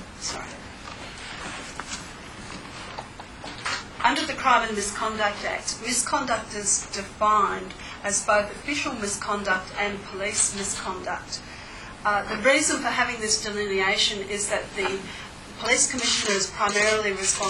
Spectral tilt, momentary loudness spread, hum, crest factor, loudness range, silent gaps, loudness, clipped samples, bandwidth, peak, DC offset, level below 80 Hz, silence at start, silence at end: -1.5 dB/octave; 17 LU; none; 22 dB; 6 LU; none; -24 LUFS; under 0.1%; 16 kHz; -4 dBFS; under 0.1%; -50 dBFS; 0 s; 0 s